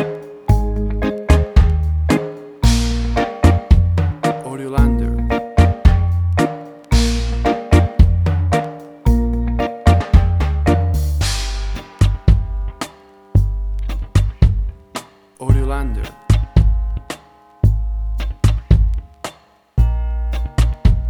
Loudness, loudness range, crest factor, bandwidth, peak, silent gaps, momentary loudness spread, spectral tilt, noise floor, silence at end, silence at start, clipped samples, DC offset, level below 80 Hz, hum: -18 LUFS; 4 LU; 16 dB; 13 kHz; 0 dBFS; none; 12 LU; -6.5 dB/octave; -42 dBFS; 0 s; 0 s; under 0.1%; under 0.1%; -18 dBFS; none